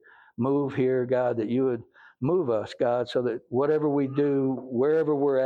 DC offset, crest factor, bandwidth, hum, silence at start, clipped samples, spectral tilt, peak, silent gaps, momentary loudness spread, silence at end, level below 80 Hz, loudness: under 0.1%; 12 dB; 7.6 kHz; none; 0.4 s; under 0.1%; -8.5 dB/octave; -14 dBFS; none; 5 LU; 0 s; -68 dBFS; -26 LUFS